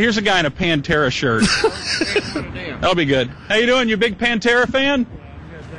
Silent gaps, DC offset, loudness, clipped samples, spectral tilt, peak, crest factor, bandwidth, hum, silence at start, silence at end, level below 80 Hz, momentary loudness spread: none; under 0.1%; -17 LUFS; under 0.1%; -4 dB/octave; -4 dBFS; 14 dB; 11 kHz; none; 0 s; 0 s; -40 dBFS; 11 LU